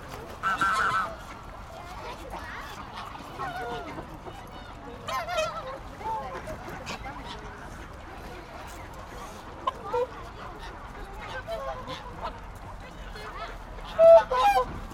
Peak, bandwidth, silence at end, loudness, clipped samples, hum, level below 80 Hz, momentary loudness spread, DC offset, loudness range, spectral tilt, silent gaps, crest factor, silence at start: -6 dBFS; 16 kHz; 0 s; -28 LUFS; under 0.1%; none; -46 dBFS; 19 LU; under 0.1%; 14 LU; -4.5 dB/octave; none; 22 dB; 0 s